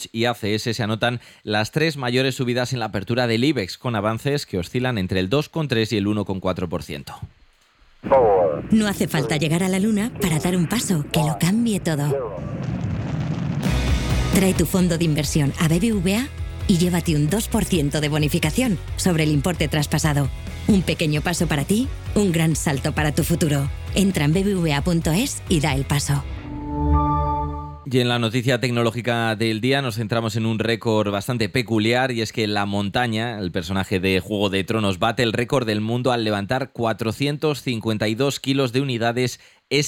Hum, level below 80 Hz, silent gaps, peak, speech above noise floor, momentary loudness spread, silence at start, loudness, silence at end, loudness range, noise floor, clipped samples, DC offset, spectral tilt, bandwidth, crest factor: none; -36 dBFS; none; -6 dBFS; 34 dB; 6 LU; 0 s; -21 LUFS; 0 s; 2 LU; -55 dBFS; under 0.1%; under 0.1%; -5.5 dB/octave; 18 kHz; 16 dB